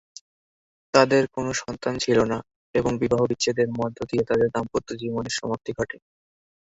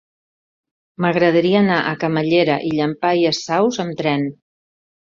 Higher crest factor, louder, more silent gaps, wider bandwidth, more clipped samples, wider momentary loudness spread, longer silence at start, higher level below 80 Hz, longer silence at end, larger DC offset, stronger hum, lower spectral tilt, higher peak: first, 22 dB vs 16 dB; second, -24 LUFS vs -18 LUFS; first, 2.56-2.74 s vs none; about the same, 8 kHz vs 7.6 kHz; neither; first, 10 LU vs 6 LU; about the same, 0.95 s vs 1 s; first, -52 dBFS vs -60 dBFS; about the same, 0.75 s vs 0.75 s; neither; neither; second, -4.5 dB/octave vs -6 dB/octave; about the same, -4 dBFS vs -2 dBFS